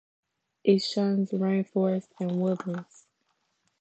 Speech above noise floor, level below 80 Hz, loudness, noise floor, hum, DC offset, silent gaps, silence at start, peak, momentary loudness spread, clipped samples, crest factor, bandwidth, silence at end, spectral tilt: 48 dB; -80 dBFS; -27 LUFS; -75 dBFS; none; under 0.1%; none; 0.65 s; -10 dBFS; 8 LU; under 0.1%; 20 dB; 8.2 kHz; 1 s; -7 dB/octave